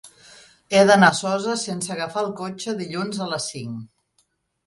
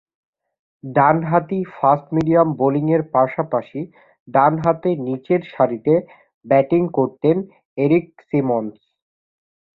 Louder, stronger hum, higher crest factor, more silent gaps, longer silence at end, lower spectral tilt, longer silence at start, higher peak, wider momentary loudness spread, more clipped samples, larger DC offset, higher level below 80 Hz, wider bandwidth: second, -21 LUFS vs -18 LUFS; neither; about the same, 22 dB vs 18 dB; second, none vs 4.20-4.26 s, 6.34-6.41 s, 7.65-7.76 s; second, 0.8 s vs 1.05 s; second, -4 dB/octave vs -10.5 dB/octave; second, 0.05 s vs 0.85 s; about the same, -2 dBFS vs -2 dBFS; first, 15 LU vs 8 LU; neither; neither; second, -64 dBFS vs -58 dBFS; first, 11.5 kHz vs 6.6 kHz